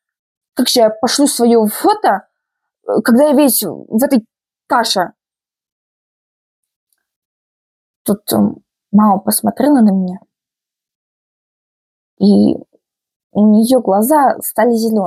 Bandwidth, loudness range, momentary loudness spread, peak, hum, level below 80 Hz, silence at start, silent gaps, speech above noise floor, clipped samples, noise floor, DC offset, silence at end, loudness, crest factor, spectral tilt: 15.5 kHz; 9 LU; 9 LU; -2 dBFS; none; -62 dBFS; 0.55 s; 5.72-6.63 s, 6.76-6.86 s, 7.16-8.05 s, 10.95-12.17 s, 13.16-13.30 s; over 78 dB; under 0.1%; under -90 dBFS; under 0.1%; 0 s; -13 LUFS; 14 dB; -5 dB/octave